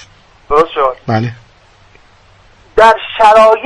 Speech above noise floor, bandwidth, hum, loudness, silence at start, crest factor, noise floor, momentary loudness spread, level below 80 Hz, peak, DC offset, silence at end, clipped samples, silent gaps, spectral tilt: 36 dB; 11 kHz; none; -10 LUFS; 0.5 s; 12 dB; -45 dBFS; 11 LU; -38 dBFS; 0 dBFS; under 0.1%; 0 s; 0.2%; none; -5.5 dB/octave